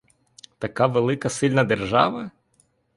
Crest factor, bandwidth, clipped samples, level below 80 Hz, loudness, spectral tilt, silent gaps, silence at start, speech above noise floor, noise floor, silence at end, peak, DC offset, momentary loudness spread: 22 dB; 11.5 kHz; under 0.1%; -54 dBFS; -22 LUFS; -5.5 dB/octave; none; 0.6 s; 43 dB; -64 dBFS; 0.65 s; -2 dBFS; under 0.1%; 13 LU